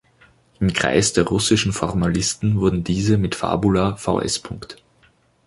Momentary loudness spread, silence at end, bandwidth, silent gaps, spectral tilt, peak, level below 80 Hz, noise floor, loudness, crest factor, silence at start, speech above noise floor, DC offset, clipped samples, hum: 7 LU; 0.7 s; 11.5 kHz; none; -4.5 dB/octave; -2 dBFS; -40 dBFS; -58 dBFS; -20 LUFS; 18 dB; 0.6 s; 38 dB; under 0.1%; under 0.1%; none